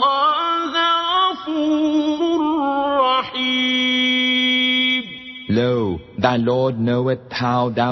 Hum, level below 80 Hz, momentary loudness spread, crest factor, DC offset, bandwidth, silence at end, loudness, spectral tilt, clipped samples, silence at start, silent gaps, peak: none; -54 dBFS; 7 LU; 18 dB; under 0.1%; 6.2 kHz; 0 s; -18 LUFS; -5.5 dB/octave; under 0.1%; 0 s; none; -2 dBFS